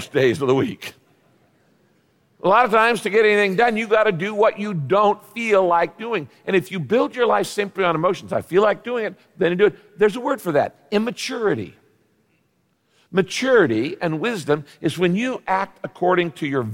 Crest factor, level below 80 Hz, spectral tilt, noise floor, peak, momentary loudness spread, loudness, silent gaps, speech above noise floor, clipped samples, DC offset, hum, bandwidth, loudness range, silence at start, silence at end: 16 dB; -62 dBFS; -5.5 dB/octave; -66 dBFS; -4 dBFS; 9 LU; -20 LUFS; none; 46 dB; under 0.1%; under 0.1%; none; 17 kHz; 5 LU; 0 s; 0 s